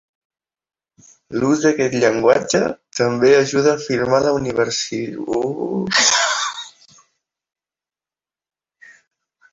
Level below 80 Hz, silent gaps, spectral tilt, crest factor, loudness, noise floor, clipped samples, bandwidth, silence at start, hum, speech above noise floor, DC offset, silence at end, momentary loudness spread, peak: -56 dBFS; none; -3.5 dB/octave; 18 dB; -17 LUFS; under -90 dBFS; under 0.1%; 8 kHz; 1.3 s; none; over 73 dB; under 0.1%; 2.85 s; 10 LU; -2 dBFS